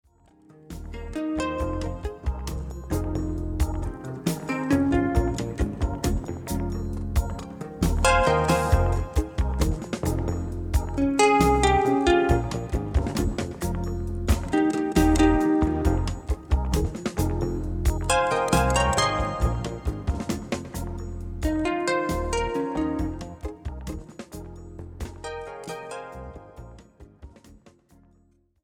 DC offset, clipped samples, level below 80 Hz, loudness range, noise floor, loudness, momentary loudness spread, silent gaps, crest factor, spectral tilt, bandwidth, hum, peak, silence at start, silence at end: under 0.1%; under 0.1%; -30 dBFS; 14 LU; -62 dBFS; -25 LUFS; 16 LU; none; 18 dB; -5.5 dB/octave; 18.5 kHz; none; -6 dBFS; 0.7 s; 1.1 s